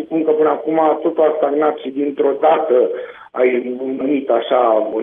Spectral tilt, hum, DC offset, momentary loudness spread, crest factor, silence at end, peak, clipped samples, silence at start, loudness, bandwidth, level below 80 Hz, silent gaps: -9 dB/octave; none; under 0.1%; 7 LU; 12 dB; 0 s; -4 dBFS; under 0.1%; 0 s; -16 LUFS; 3.8 kHz; -70 dBFS; none